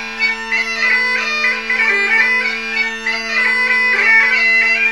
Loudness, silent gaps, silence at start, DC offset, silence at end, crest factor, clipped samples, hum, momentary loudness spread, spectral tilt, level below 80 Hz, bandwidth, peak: -13 LUFS; none; 0 s; 0.6%; 0 s; 14 dB; under 0.1%; none; 7 LU; -1 dB/octave; -52 dBFS; 14 kHz; -2 dBFS